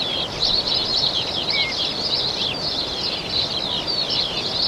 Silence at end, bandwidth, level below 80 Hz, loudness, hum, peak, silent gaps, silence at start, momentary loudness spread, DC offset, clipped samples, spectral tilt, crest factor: 0 s; 16.5 kHz; -46 dBFS; -20 LUFS; none; -8 dBFS; none; 0 s; 4 LU; under 0.1%; under 0.1%; -2.5 dB/octave; 16 dB